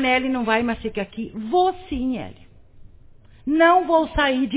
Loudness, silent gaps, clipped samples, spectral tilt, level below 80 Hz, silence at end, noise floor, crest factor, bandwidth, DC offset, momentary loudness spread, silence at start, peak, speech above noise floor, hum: -21 LUFS; none; under 0.1%; -9 dB/octave; -42 dBFS; 0 s; -47 dBFS; 16 dB; 4 kHz; under 0.1%; 15 LU; 0 s; -4 dBFS; 27 dB; none